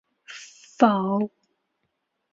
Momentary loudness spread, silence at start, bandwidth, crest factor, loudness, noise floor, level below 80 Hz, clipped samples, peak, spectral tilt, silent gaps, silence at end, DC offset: 21 LU; 0.3 s; 7.8 kHz; 24 dB; -23 LUFS; -77 dBFS; -70 dBFS; under 0.1%; -2 dBFS; -6.5 dB/octave; none; 1.05 s; under 0.1%